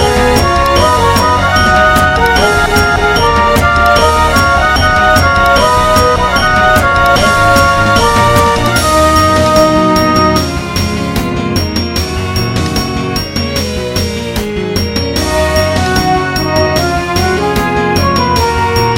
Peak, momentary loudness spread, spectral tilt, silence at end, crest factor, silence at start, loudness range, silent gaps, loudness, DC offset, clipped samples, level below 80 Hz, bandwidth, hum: 0 dBFS; 7 LU; -4.5 dB/octave; 0 s; 10 dB; 0 s; 6 LU; none; -10 LUFS; 0.3%; under 0.1%; -22 dBFS; 17.5 kHz; none